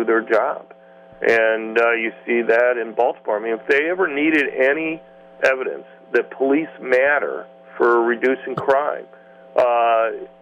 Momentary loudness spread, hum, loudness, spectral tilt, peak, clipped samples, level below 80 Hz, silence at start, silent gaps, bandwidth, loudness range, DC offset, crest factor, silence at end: 9 LU; none; -19 LUFS; -5.5 dB/octave; -4 dBFS; under 0.1%; -66 dBFS; 0 s; none; 9.6 kHz; 2 LU; under 0.1%; 16 dB; 0.15 s